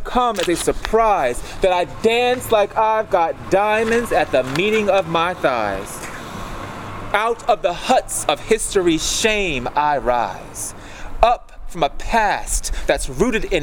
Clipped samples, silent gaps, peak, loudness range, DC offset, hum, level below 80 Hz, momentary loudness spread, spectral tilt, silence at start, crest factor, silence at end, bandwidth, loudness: under 0.1%; none; 0 dBFS; 3 LU; under 0.1%; none; -32 dBFS; 12 LU; -3.5 dB/octave; 0 s; 18 dB; 0 s; 19.5 kHz; -18 LUFS